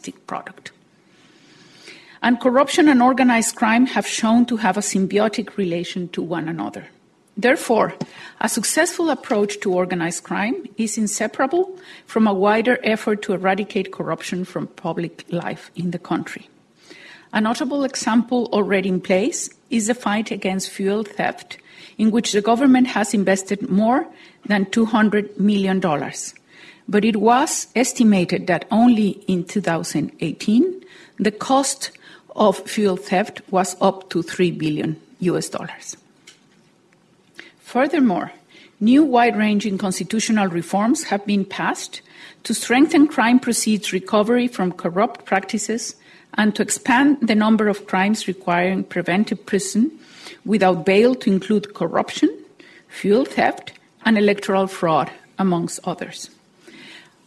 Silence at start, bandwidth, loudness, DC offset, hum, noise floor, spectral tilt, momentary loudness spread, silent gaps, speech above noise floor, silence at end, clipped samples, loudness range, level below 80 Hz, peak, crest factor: 0.05 s; 12.5 kHz; -19 LUFS; under 0.1%; none; -56 dBFS; -4.5 dB/octave; 13 LU; none; 37 dB; 0.25 s; under 0.1%; 5 LU; -62 dBFS; -4 dBFS; 16 dB